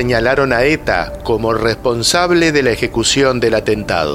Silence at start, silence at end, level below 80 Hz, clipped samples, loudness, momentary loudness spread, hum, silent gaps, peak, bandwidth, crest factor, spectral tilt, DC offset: 0 s; 0 s; -32 dBFS; under 0.1%; -14 LUFS; 5 LU; none; none; 0 dBFS; 16 kHz; 14 dB; -4 dB/octave; under 0.1%